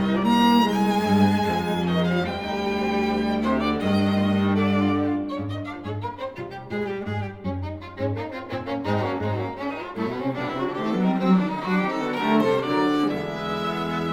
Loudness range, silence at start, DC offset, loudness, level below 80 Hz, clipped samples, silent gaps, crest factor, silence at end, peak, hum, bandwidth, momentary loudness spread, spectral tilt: 7 LU; 0 s; under 0.1%; -24 LUFS; -50 dBFS; under 0.1%; none; 16 dB; 0 s; -6 dBFS; none; 19 kHz; 11 LU; -7 dB/octave